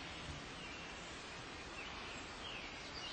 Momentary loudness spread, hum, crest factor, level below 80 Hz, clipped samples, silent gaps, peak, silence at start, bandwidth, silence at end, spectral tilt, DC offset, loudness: 2 LU; none; 14 dB; -62 dBFS; under 0.1%; none; -36 dBFS; 0 s; 8.8 kHz; 0 s; -3 dB/octave; under 0.1%; -48 LUFS